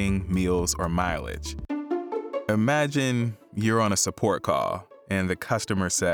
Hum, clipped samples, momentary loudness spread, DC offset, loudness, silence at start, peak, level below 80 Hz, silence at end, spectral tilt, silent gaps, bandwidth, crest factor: none; under 0.1%; 9 LU; under 0.1%; -26 LUFS; 0 s; -10 dBFS; -44 dBFS; 0 s; -4.5 dB/octave; none; over 20 kHz; 16 dB